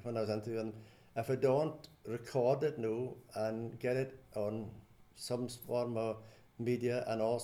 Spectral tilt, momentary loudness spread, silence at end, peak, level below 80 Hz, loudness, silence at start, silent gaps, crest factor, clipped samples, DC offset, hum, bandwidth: -6.5 dB/octave; 12 LU; 0 s; -20 dBFS; -70 dBFS; -37 LUFS; 0 s; none; 18 dB; under 0.1%; under 0.1%; none; 19 kHz